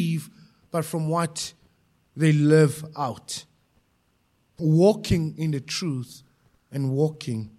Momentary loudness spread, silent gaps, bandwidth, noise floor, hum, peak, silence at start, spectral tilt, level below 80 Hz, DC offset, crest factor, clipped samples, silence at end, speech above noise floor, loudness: 16 LU; none; 13.5 kHz; -67 dBFS; none; -6 dBFS; 0 s; -6.5 dB/octave; -50 dBFS; under 0.1%; 18 dB; under 0.1%; 0.1 s; 44 dB; -24 LUFS